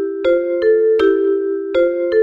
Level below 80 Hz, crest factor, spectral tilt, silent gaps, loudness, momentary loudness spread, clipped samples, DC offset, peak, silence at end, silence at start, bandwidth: -52 dBFS; 12 dB; -6 dB/octave; none; -15 LUFS; 4 LU; under 0.1%; under 0.1%; -4 dBFS; 0 s; 0 s; 5.2 kHz